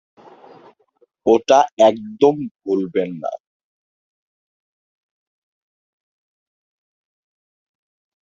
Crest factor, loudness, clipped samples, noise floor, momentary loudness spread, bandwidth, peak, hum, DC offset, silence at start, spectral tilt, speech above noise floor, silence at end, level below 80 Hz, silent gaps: 22 dB; -17 LUFS; under 0.1%; -61 dBFS; 14 LU; 7.6 kHz; 0 dBFS; none; under 0.1%; 1.25 s; -5.5 dB/octave; 44 dB; 5 s; -64 dBFS; 1.72-1.77 s, 2.51-2.55 s